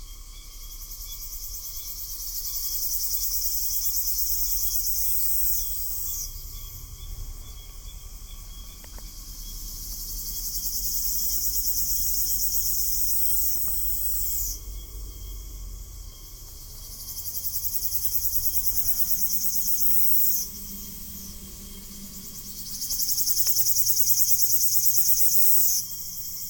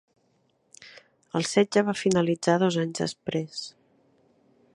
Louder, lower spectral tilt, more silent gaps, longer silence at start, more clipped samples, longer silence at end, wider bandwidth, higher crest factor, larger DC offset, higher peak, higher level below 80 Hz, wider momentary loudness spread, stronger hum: first, -21 LUFS vs -26 LUFS; second, -0.5 dB/octave vs -5 dB/octave; neither; second, 0 s vs 0.8 s; neither; second, 0 s vs 1.05 s; first, 19.5 kHz vs 11.5 kHz; about the same, 24 dB vs 20 dB; neither; first, -2 dBFS vs -6 dBFS; first, -42 dBFS vs -68 dBFS; first, 24 LU vs 16 LU; neither